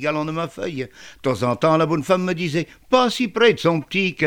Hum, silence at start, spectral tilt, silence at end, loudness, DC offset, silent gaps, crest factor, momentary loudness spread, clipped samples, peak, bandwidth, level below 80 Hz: none; 0 s; -5.5 dB/octave; 0 s; -20 LUFS; 0.2%; none; 18 dB; 11 LU; under 0.1%; -2 dBFS; 17.5 kHz; -56 dBFS